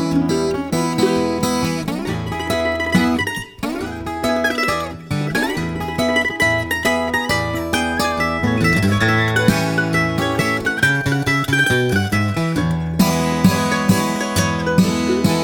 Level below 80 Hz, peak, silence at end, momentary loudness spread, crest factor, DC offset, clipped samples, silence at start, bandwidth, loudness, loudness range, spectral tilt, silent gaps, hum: -40 dBFS; 0 dBFS; 0 s; 7 LU; 18 dB; under 0.1%; under 0.1%; 0 s; over 20 kHz; -18 LUFS; 3 LU; -5 dB/octave; none; none